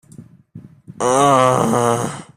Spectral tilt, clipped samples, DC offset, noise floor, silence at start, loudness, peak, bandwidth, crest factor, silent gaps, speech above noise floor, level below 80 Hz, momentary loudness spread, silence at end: -5 dB/octave; under 0.1%; under 0.1%; -42 dBFS; 0.2 s; -15 LUFS; -2 dBFS; 15.5 kHz; 16 dB; none; 27 dB; -54 dBFS; 9 LU; 0.15 s